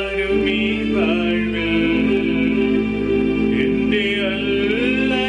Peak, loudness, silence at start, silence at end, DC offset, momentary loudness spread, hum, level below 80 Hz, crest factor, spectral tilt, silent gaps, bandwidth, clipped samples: -8 dBFS; -18 LUFS; 0 s; 0 s; under 0.1%; 2 LU; none; -38 dBFS; 10 dB; -6.5 dB/octave; none; 9.8 kHz; under 0.1%